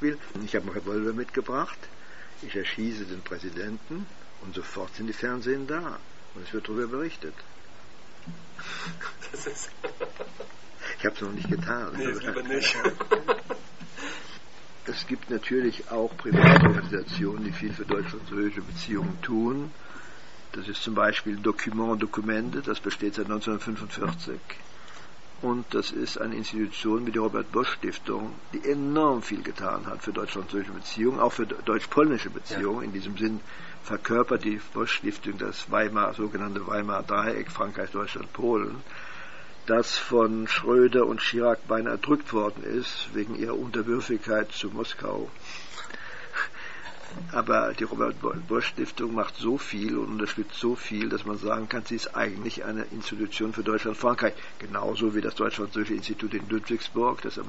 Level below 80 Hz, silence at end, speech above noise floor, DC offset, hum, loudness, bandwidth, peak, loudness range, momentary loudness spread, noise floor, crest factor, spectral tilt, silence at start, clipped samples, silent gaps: -58 dBFS; 0 s; 23 dB; 1%; none; -28 LUFS; 8 kHz; 0 dBFS; 11 LU; 15 LU; -51 dBFS; 28 dB; -4.5 dB/octave; 0 s; under 0.1%; none